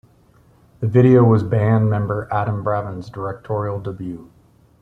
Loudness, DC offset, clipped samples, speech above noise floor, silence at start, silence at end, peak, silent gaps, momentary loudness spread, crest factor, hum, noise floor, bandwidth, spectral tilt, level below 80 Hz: -18 LUFS; under 0.1%; under 0.1%; 35 dB; 0.8 s; 0.6 s; -2 dBFS; none; 17 LU; 16 dB; none; -53 dBFS; 4.8 kHz; -10.5 dB/octave; -50 dBFS